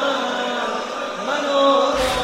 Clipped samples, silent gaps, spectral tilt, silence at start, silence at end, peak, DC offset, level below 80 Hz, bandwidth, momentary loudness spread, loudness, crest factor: under 0.1%; none; -3 dB/octave; 0 s; 0 s; -6 dBFS; under 0.1%; -44 dBFS; 16 kHz; 9 LU; -20 LUFS; 14 dB